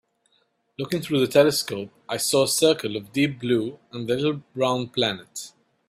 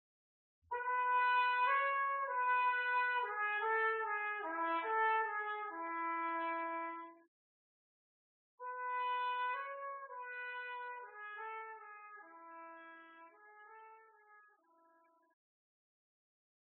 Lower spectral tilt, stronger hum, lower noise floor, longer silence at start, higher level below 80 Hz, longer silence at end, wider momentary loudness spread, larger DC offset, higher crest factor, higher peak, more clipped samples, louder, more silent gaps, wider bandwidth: first, -4 dB/octave vs 3 dB/octave; neither; about the same, -68 dBFS vs -71 dBFS; about the same, 0.8 s vs 0.7 s; first, -64 dBFS vs under -90 dBFS; second, 0.4 s vs 2.2 s; second, 15 LU vs 21 LU; neither; about the same, 20 dB vs 16 dB; first, -4 dBFS vs -24 dBFS; neither; first, -23 LUFS vs -37 LUFS; second, none vs 7.28-8.58 s; first, 16 kHz vs 4.2 kHz